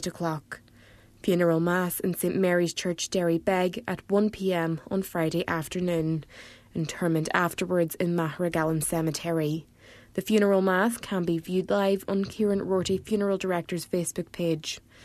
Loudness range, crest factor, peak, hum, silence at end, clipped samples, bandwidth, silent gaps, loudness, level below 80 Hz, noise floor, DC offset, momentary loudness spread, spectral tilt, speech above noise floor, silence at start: 2 LU; 22 dB; -6 dBFS; none; 0 s; under 0.1%; 14 kHz; none; -27 LUFS; -58 dBFS; -54 dBFS; under 0.1%; 9 LU; -5.5 dB/octave; 28 dB; 0 s